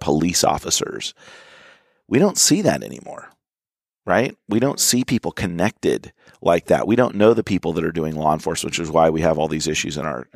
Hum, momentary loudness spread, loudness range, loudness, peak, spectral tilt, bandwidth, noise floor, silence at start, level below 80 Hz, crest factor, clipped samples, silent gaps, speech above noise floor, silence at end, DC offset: none; 11 LU; 3 LU; -19 LUFS; -2 dBFS; -4 dB/octave; 15.5 kHz; under -90 dBFS; 0 s; -48 dBFS; 18 dB; under 0.1%; none; over 70 dB; 0.1 s; under 0.1%